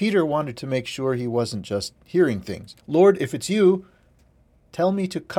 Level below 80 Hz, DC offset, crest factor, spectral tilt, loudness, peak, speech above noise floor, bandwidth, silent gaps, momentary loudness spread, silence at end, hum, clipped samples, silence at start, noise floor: -58 dBFS; under 0.1%; 18 dB; -6 dB/octave; -22 LUFS; -6 dBFS; 36 dB; 15 kHz; none; 11 LU; 0 s; none; under 0.1%; 0 s; -58 dBFS